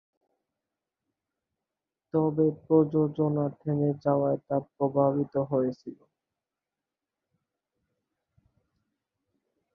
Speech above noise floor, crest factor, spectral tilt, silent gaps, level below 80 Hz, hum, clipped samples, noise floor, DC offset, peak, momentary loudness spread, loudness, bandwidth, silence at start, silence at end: 63 dB; 20 dB; -12 dB/octave; none; -70 dBFS; none; under 0.1%; -89 dBFS; under 0.1%; -10 dBFS; 8 LU; -27 LUFS; 5.6 kHz; 2.15 s; 3.8 s